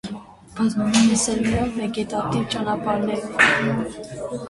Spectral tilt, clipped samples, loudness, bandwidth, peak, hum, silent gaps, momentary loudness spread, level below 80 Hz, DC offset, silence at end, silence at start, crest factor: -4 dB/octave; under 0.1%; -21 LUFS; 11.5 kHz; -2 dBFS; none; none; 15 LU; -46 dBFS; under 0.1%; 0 s; 0.05 s; 20 dB